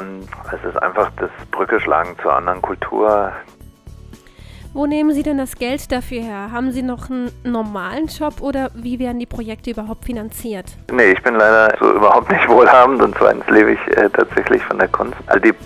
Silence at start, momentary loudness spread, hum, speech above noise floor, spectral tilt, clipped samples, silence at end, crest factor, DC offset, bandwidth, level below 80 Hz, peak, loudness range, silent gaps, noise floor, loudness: 0 s; 16 LU; none; 24 dB; -5.5 dB/octave; under 0.1%; 0 s; 16 dB; under 0.1%; 16 kHz; -40 dBFS; 0 dBFS; 12 LU; none; -39 dBFS; -15 LUFS